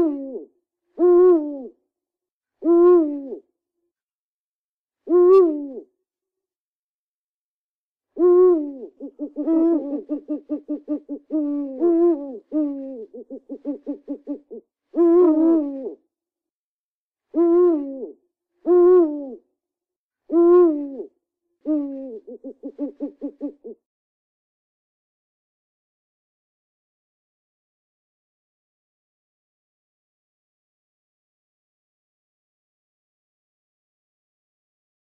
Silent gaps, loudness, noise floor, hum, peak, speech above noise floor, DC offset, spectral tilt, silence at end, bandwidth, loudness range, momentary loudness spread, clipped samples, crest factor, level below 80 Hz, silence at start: 2.32-2.41 s, 4.02-4.88 s, 6.56-7.95 s, 16.50-17.11 s, 19.96-20.10 s; -19 LUFS; under -90 dBFS; none; -6 dBFS; over 70 dB; under 0.1%; -9 dB/octave; 11.3 s; 2.8 kHz; 12 LU; 22 LU; under 0.1%; 16 dB; -68 dBFS; 0 s